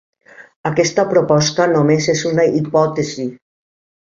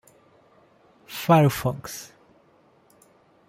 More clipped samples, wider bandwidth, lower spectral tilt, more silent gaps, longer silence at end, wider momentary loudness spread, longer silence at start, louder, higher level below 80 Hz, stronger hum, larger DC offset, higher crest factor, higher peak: neither; second, 7.8 kHz vs 16 kHz; about the same, -5 dB/octave vs -6 dB/octave; first, 0.56-0.64 s vs none; second, 0.8 s vs 1.45 s; second, 9 LU vs 20 LU; second, 0.4 s vs 1.1 s; first, -15 LUFS vs -22 LUFS; about the same, -54 dBFS vs -58 dBFS; neither; neither; second, 16 dB vs 22 dB; first, -2 dBFS vs -6 dBFS